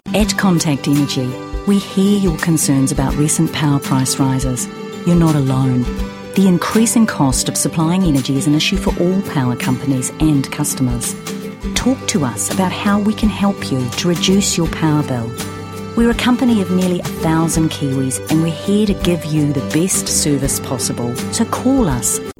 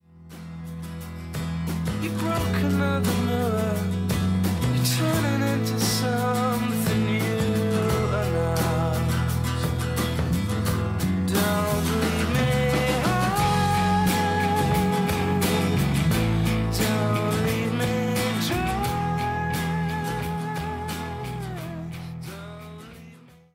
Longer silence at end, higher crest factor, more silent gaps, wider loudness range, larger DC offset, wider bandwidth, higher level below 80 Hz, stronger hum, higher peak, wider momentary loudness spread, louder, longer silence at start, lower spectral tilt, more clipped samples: second, 0.05 s vs 0.35 s; about the same, 14 dB vs 14 dB; neither; about the same, 3 LU vs 5 LU; neither; about the same, 17 kHz vs 16 kHz; first, -32 dBFS vs -40 dBFS; neither; first, 0 dBFS vs -10 dBFS; second, 7 LU vs 12 LU; first, -16 LUFS vs -24 LUFS; about the same, 0.05 s vs 0.15 s; about the same, -5 dB/octave vs -5.5 dB/octave; neither